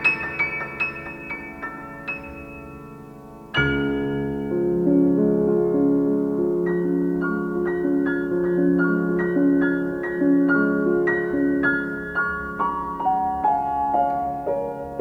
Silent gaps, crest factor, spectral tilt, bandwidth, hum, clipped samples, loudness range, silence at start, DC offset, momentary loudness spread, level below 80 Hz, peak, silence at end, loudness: none; 14 dB; -8.5 dB/octave; 5.6 kHz; none; under 0.1%; 7 LU; 0 s; under 0.1%; 13 LU; -48 dBFS; -8 dBFS; 0 s; -22 LUFS